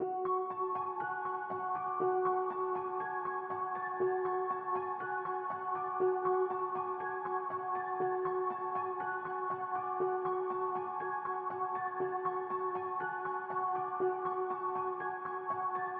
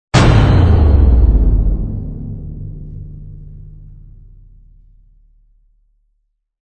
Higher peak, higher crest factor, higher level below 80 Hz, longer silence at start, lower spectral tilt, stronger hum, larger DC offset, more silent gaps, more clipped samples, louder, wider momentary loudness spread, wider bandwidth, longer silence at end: second, -20 dBFS vs 0 dBFS; about the same, 14 dB vs 14 dB; second, -86 dBFS vs -18 dBFS; second, 0 s vs 0.15 s; second, -5.5 dB/octave vs -7 dB/octave; neither; neither; neither; neither; second, -36 LUFS vs -13 LUFS; second, 4 LU vs 24 LU; second, 3.7 kHz vs 9.2 kHz; second, 0 s vs 2.8 s